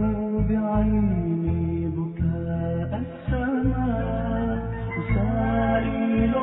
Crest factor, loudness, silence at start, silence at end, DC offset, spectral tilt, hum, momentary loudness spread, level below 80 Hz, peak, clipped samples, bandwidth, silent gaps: 14 dB; -25 LUFS; 0 s; 0 s; under 0.1%; -12.5 dB/octave; none; 6 LU; -32 dBFS; -10 dBFS; under 0.1%; 3.9 kHz; none